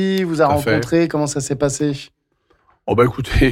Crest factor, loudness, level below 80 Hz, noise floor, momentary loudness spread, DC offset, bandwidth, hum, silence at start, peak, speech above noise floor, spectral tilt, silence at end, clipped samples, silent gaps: 14 dB; -18 LUFS; -30 dBFS; -62 dBFS; 6 LU; under 0.1%; 16.5 kHz; none; 0 s; -4 dBFS; 45 dB; -5.5 dB/octave; 0 s; under 0.1%; none